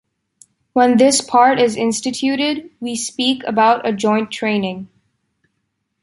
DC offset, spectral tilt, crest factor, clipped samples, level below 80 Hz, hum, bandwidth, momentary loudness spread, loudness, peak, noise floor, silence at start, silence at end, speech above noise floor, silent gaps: under 0.1%; -3.5 dB/octave; 16 dB; under 0.1%; -62 dBFS; none; 11.5 kHz; 11 LU; -16 LUFS; -2 dBFS; -72 dBFS; 0.75 s; 1.15 s; 56 dB; none